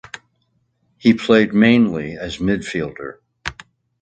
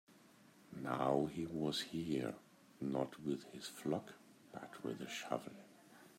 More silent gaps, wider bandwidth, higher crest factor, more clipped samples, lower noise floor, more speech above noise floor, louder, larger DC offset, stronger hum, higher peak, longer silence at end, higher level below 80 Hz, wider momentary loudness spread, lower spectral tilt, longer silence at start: neither; second, 8.8 kHz vs 16 kHz; about the same, 18 dB vs 22 dB; neither; about the same, -66 dBFS vs -65 dBFS; first, 50 dB vs 24 dB; first, -17 LUFS vs -42 LUFS; neither; neither; first, 0 dBFS vs -22 dBFS; first, 0.5 s vs 0 s; first, -46 dBFS vs -76 dBFS; about the same, 20 LU vs 19 LU; about the same, -6 dB/octave vs -5.5 dB/octave; first, 1.05 s vs 0.1 s